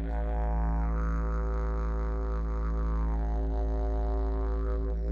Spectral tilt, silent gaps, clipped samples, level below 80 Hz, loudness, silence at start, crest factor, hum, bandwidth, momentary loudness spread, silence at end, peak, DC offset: -9.5 dB/octave; none; under 0.1%; -30 dBFS; -32 LUFS; 0 s; 8 dB; none; 2.5 kHz; 2 LU; 0 s; -20 dBFS; under 0.1%